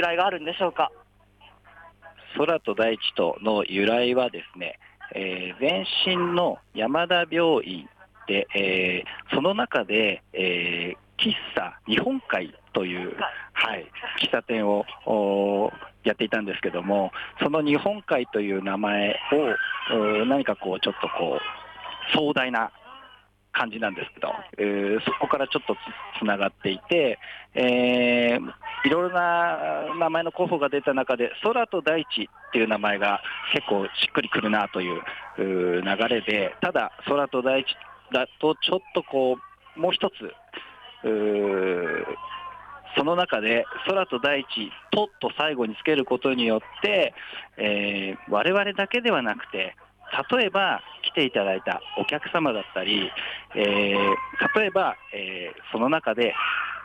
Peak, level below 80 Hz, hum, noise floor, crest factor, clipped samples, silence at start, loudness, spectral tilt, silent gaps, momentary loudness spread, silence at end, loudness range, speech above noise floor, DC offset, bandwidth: -10 dBFS; -64 dBFS; none; -55 dBFS; 16 dB; under 0.1%; 0 s; -25 LUFS; -6 dB/octave; none; 9 LU; 0 s; 3 LU; 30 dB; under 0.1%; 9.6 kHz